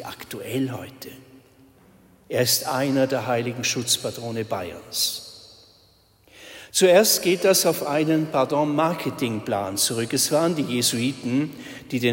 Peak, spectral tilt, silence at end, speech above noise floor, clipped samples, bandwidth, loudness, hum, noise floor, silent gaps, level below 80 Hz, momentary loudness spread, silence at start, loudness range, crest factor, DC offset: -4 dBFS; -3.5 dB/octave; 0 s; 35 dB; under 0.1%; 16.5 kHz; -22 LUFS; none; -58 dBFS; none; -64 dBFS; 16 LU; 0 s; 6 LU; 18 dB; under 0.1%